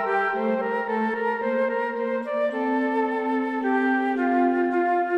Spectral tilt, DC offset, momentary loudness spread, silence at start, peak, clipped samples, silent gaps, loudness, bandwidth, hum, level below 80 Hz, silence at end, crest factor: -7 dB/octave; under 0.1%; 4 LU; 0 s; -12 dBFS; under 0.1%; none; -24 LUFS; 5.6 kHz; none; -76 dBFS; 0 s; 12 dB